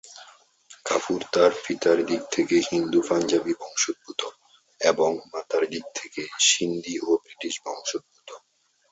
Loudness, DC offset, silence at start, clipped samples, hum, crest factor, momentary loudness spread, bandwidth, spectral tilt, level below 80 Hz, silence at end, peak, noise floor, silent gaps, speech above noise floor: -24 LUFS; under 0.1%; 0.05 s; under 0.1%; none; 20 dB; 13 LU; 8.2 kHz; -2.5 dB/octave; -68 dBFS; 0.55 s; -6 dBFS; -68 dBFS; none; 43 dB